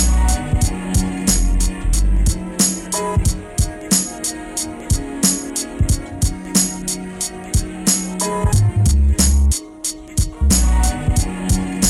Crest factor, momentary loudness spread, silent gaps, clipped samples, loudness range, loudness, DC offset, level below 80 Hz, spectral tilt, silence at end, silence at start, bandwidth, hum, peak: 16 dB; 8 LU; none; under 0.1%; 3 LU; -18 LUFS; under 0.1%; -20 dBFS; -4 dB/octave; 0 s; 0 s; 16.5 kHz; none; -2 dBFS